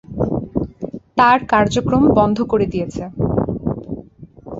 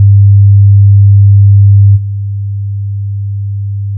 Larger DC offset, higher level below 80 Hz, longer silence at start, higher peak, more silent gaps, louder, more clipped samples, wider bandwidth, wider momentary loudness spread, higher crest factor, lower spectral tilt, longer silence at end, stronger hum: neither; about the same, -38 dBFS vs -38 dBFS; about the same, 0.1 s vs 0 s; about the same, 0 dBFS vs 0 dBFS; neither; second, -17 LUFS vs -8 LUFS; second, under 0.1% vs 0.2%; first, 7.8 kHz vs 0.2 kHz; about the same, 14 LU vs 12 LU; first, 18 dB vs 6 dB; second, -7 dB/octave vs -27 dB/octave; about the same, 0 s vs 0 s; neither